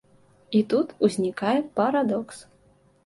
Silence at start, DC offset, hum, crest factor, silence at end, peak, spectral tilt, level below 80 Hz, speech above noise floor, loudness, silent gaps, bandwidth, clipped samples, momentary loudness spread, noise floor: 0.5 s; under 0.1%; none; 18 dB; 0.65 s; -8 dBFS; -6 dB/octave; -66 dBFS; 36 dB; -24 LUFS; none; 11.5 kHz; under 0.1%; 8 LU; -60 dBFS